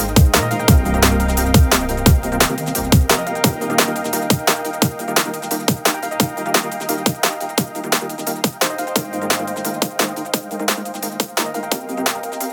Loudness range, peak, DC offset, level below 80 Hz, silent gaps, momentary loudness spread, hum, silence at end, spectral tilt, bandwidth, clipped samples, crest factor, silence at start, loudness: 6 LU; 0 dBFS; under 0.1%; -26 dBFS; none; 7 LU; none; 0 s; -4 dB/octave; 19.5 kHz; under 0.1%; 18 dB; 0 s; -18 LUFS